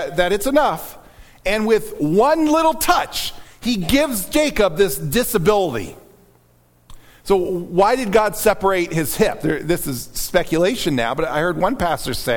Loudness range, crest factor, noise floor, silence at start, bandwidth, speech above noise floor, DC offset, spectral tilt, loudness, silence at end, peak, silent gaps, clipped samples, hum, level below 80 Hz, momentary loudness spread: 3 LU; 16 dB; -55 dBFS; 0 s; 19 kHz; 37 dB; under 0.1%; -4.5 dB/octave; -18 LUFS; 0 s; -2 dBFS; none; under 0.1%; none; -38 dBFS; 8 LU